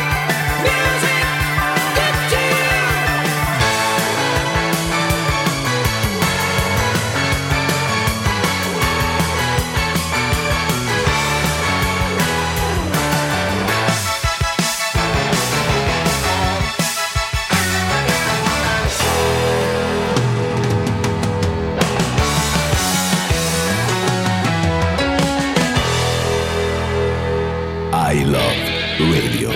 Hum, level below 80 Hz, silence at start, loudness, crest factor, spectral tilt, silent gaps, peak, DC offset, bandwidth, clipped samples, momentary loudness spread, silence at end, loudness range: none; -32 dBFS; 0 s; -17 LUFS; 16 dB; -4 dB/octave; none; 0 dBFS; under 0.1%; 16.5 kHz; under 0.1%; 3 LU; 0 s; 2 LU